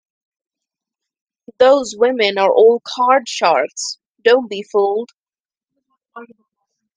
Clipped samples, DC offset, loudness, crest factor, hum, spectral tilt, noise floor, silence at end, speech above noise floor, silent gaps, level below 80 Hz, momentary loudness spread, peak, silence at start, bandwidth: under 0.1%; under 0.1%; -15 LUFS; 18 dB; none; -2.5 dB/octave; under -90 dBFS; 0.7 s; over 76 dB; 4.09-4.15 s, 5.16-5.26 s, 5.40-5.45 s; -66 dBFS; 11 LU; 0 dBFS; 1.6 s; 10 kHz